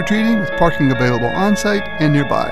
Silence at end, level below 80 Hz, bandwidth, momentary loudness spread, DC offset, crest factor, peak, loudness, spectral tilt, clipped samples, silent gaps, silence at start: 0 s; -34 dBFS; 14 kHz; 2 LU; 4%; 16 dB; 0 dBFS; -16 LUFS; -6 dB/octave; under 0.1%; none; 0 s